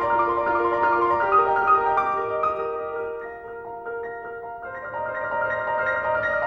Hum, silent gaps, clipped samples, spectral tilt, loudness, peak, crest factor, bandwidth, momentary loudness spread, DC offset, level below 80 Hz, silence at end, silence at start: none; none; under 0.1%; -6.5 dB/octave; -23 LUFS; -8 dBFS; 16 dB; 6.4 kHz; 15 LU; under 0.1%; -54 dBFS; 0 s; 0 s